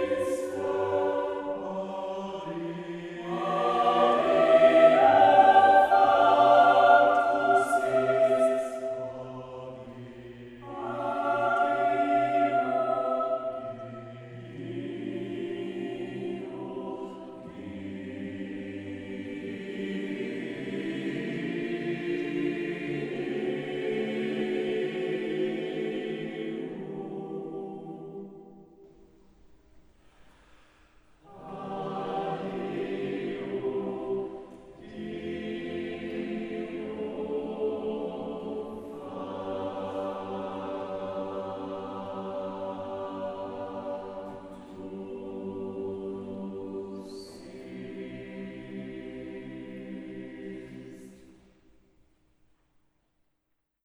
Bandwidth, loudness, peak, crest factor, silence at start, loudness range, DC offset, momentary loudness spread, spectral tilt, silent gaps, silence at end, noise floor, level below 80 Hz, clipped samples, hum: 12 kHz; -28 LUFS; -6 dBFS; 22 dB; 0 s; 20 LU; under 0.1%; 21 LU; -6 dB/octave; none; 2.5 s; -79 dBFS; -66 dBFS; under 0.1%; none